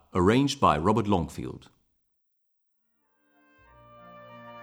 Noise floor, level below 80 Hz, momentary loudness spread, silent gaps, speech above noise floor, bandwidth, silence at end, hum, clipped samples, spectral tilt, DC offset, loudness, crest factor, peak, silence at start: -74 dBFS; -52 dBFS; 24 LU; none; 50 dB; over 20 kHz; 0 s; none; under 0.1%; -6 dB/octave; under 0.1%; -24 LUFS; 22 dB; -6 dBFS; 0.15 s